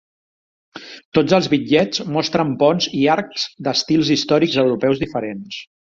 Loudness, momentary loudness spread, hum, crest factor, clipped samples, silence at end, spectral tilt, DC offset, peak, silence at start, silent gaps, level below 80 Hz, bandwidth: -18 LUFS; 12 LU; none; 18 dB; under 0.1%; 0.2 s; -5 dB/octave; under 0.1%; -2 dBFS; 0.75 s; 1.05-1.12 s; -54 dBFS; 7.6 kHz